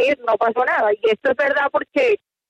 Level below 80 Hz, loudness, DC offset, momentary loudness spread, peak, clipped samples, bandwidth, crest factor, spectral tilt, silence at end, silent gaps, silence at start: -64 dBFS; -18 LUFS; under 0.1%; 2 LU; -6 dBFS; under 0.1%; 8.6 kHz; 12 dB; -4.5 dB/octave; 0.35 s; none; 0 s